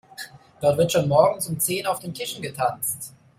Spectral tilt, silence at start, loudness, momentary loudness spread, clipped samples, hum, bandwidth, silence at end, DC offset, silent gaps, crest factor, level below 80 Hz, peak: -4 dB/octave; 0.2 s; -23 LUFS; 15 LU; under 0.1%; none; 16 kHz; 0.3 s; under 0.1%; none; 20 dB; -60 dBFS; -4 dBFS